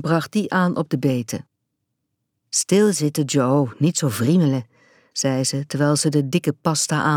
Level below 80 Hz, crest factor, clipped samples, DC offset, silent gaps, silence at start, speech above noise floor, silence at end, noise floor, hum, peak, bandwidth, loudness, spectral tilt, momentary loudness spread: -68 dBFS; 18 dB; under 0.1%; under 0.1%; none; 0 s; 57 dB; 0 s; -76 dBFS; none; -4 dBFS; 18 kHz; -20 LUFS; -5 dB/octave; 6 LU